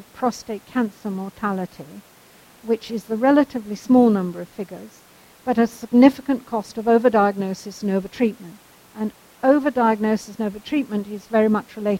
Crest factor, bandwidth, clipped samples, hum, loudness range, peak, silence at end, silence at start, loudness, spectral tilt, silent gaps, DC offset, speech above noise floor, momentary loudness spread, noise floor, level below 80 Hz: 20 dB; 16.5 kHz; under 0.1%; none; 4 LU; 0 dBFS; 0 s; 0.15 s; -21 LUFS; -6.5 dB/octave; none; under 0.1%; 29 dB; 16 LU; -50 dBFS; -60 dBFS